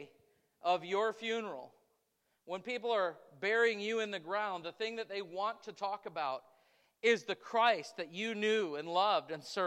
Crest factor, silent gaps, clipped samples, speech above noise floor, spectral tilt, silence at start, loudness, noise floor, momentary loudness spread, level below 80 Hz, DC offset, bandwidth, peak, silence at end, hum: 20 dB; none; under 0.1%; 45 dB; -3.5 dB/octave; 0 s; -35 LUFS; -80 dBFS; 10 LU; under -90 dBFS; under 0.1%; 11.5 kHz; -16 dBFS; 0 s; none